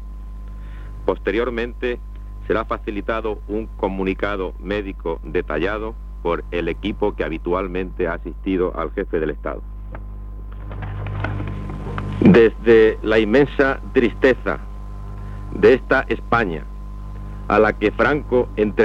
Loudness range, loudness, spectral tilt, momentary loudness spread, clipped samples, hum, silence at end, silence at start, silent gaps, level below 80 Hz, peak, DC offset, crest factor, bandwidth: 9 LU; -20 LUFS; -8 dB/octave; 20 LU; under 0.1%; 50 Hz at -30 dBFS; 0 s; 0 s; none; -32 dBFS; -2 dBFS; under 0.1%; 18 dB; 7.4 kHz